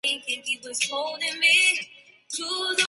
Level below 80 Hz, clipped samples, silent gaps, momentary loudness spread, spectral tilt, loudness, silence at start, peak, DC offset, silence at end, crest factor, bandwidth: -80 dBFS; under 0.1%; none; 14 LU; 1.5 dB/octave; -23 LUFS; 0.05 s; -6 dBFS; under 0.1%; 0 s; 20 dB; 12 kHz